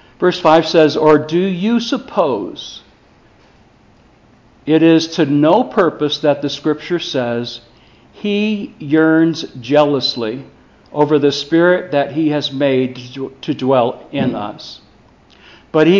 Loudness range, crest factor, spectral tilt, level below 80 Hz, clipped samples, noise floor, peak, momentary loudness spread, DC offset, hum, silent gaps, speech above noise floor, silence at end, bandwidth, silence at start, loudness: 5 LU; 16 dB; -6 dB/octave; -56 dBFS; under 0.1%; -49 dBFS; 0 dBFS; 15 LU; under 0.1%; none; none; 34 dB; 0 s; 7.4 kHz; 0.2 s; -15 LUFS